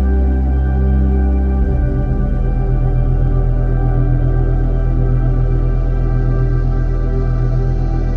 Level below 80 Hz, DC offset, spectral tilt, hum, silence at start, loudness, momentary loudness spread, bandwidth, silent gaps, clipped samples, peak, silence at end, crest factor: -14 dBFS; under 0.1%; -11 dB/octave; none; 0 s; -17 LUFS; 3 LU; 2.5 kHz; none; under 0.1%; -4 dBFS; 0 s; 10 dB